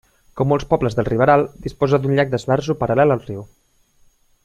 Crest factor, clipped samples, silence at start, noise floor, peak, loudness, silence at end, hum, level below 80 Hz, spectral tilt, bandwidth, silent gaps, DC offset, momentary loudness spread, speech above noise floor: 18 dB; under 0.1%; 0.35 s; -56 dBFS; -2 dBFS; -18 LUFS; 1 s; none; -44 dBFS; -7.5 dB/octave; 10.5 kHz; none; under 0.1%; 8 LU; 38 dB